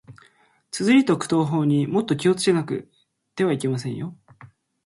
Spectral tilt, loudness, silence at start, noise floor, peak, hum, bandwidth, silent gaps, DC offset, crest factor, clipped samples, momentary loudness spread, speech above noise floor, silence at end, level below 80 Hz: -6 dB/octave; -22 LUFS; 0.1 s; -59 dBFS; -6 dBFS; none; 11.5 kHz; none; under 0.1%; 18 dB; under 0.1%; 15 LU; 38 dB; 0.4 s; -64 dBFS